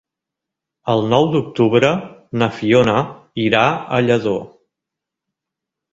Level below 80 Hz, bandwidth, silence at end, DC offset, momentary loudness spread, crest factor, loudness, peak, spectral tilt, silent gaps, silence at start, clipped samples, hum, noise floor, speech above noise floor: -52 dBFS; 7.8 kHz; 1.45 s; under 0.1%; 11 LU; 18 dB; -17 LUFS; 0 dBFS; -6.5 dB/octave; none; 0.85 s; under 0.1%; none; -83 dBFS; 68 dB